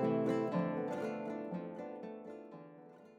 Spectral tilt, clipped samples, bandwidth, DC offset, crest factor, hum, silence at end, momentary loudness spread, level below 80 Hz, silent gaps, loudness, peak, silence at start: -8.5 dB/octave; under 0.1%; 11 kHz; under 0.1%; 16 dB; none; 0 s; 19 LU; -88 dBFS; none; -39 LUFS; -22 dBFS; 0 s